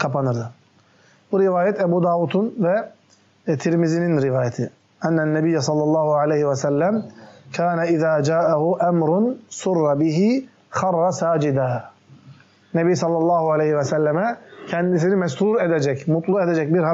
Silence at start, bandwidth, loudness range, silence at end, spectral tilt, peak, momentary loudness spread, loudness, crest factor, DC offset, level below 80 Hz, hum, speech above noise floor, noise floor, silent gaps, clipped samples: 0 s; 8 kHz; 2 LU; 0 s; -7 dB/octave; -8 dBFS; 8 LU; -20 LUFS; 12 dB; under 0.1%; -68 dBFS; none; 36 dB; -55 dBFS; none; under 0.1%